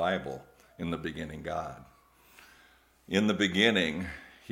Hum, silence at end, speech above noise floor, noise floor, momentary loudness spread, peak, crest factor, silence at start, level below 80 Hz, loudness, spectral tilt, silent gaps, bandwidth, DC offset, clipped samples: none; 0.2 s; 31 dB; -62 dBFS; 19 LU; -8 dBFS; 24 dB; 0 s; -60 dBFS; -30 LUFS; -5 dB/octave; none; 16.5 kHz; under 0.1%; under 0.1%